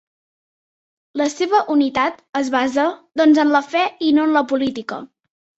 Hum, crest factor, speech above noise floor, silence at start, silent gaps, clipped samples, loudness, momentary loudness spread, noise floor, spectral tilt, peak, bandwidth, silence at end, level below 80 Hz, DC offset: none; 16 dB; over 73 dB; 1.15 s; 2.29-2.33 s; under 0.1%; -18 LUFS; 9 LU; under -90 dBFS; -3.5 dB/octave; -2 dBFS; 8 kHz; 0.55 s; -62 dBFS; under 0.1%